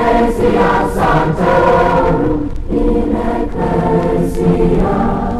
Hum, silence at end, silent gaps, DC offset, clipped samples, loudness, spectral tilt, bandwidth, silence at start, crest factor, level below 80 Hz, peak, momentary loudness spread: none; 0 s; none; under 0.1%; under 0.1%; -13 LUFS; -8 dB/octave; 13.5 kHz; 0 s; 12 dB; -22 dBFS; -2 dBFS; 6 LU